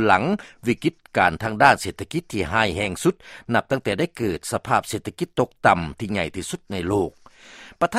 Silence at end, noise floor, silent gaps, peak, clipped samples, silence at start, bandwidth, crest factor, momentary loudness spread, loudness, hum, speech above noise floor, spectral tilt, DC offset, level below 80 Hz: 0 s; -46 dBFS; none; 0 dBFS; under 0.1%; 0 s; 16 kHz; 22 dB; 10 LU; -23 LUFS; none; 23 dB; -5 dB/octave; under 0.1%; -48 dBFS